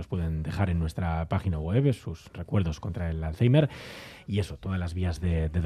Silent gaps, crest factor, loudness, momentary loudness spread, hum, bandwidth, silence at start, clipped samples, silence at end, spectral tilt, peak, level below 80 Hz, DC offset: none; 18 dB; -29 LUFS; 11 LU; none; 12.5 kHz; 0 s; under 0.1%; 0 s; -8 dB/octave; -10 dBFS; -42 dBFS; under 0.1%